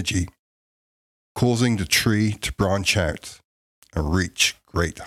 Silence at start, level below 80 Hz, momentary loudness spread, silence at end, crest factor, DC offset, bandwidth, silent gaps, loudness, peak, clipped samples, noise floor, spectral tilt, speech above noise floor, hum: 0 s; -42 dBFS; 14 LU; 0 s; 20 dB; under 0.1%; 16 kHz; 0.39-1.35 s, 3.44-3.82 s; -22 LUFS; -4 dBFS; under 0.1%; under -90 dBFS; -4 dB/octave; over 68 dB; none